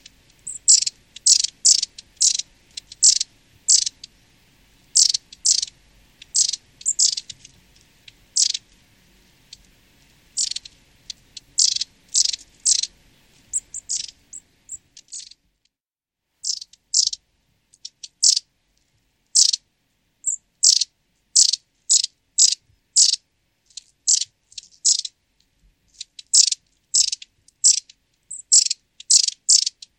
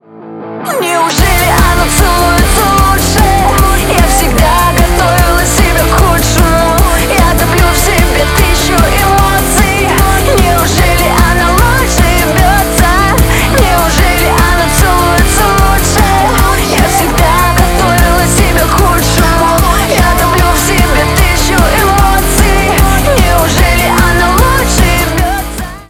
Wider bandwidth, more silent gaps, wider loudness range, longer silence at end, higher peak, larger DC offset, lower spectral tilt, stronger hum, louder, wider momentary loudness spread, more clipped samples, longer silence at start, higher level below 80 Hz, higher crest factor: second, 16.5 kHz vs 18.5 kHz; neither; first, 10 LU vs 0 LU; first, 0.3 s vs 0.05 s; about the same, 0 dBFS vs 0 dBFS; neither; second, 5 dB/octave vs -4 dB/octave; neither; second, -18 LUFS vs -8 LUFS; first, 22 LU vs 1 LU; second, under 0.1% vs 0.2%; first, 0.45 s vs 0.15 s; second, -64 dBFS vs -12 dBFS; first, 22 dB vs 8 dB